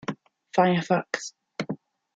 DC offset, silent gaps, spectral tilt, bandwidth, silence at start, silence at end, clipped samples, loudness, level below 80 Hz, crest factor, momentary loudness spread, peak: under 0.1%; none; -5.5 dB/octave; 8 kHz; 0.1 s; 0.4 s; under 0.1%; -27 LUFS; -72 dBFS; 22 dB; 15 LU; -6 dBFS